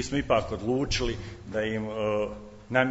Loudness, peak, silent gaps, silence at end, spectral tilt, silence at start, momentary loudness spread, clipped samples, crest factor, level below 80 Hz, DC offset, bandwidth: -29 LUFS; -6 dBFS; none; 0 s; -5 dB/octave; 0 s; 9 LU; under 0.1%; 22 dB; -42 dBFS; under 0.1%; 8 kHz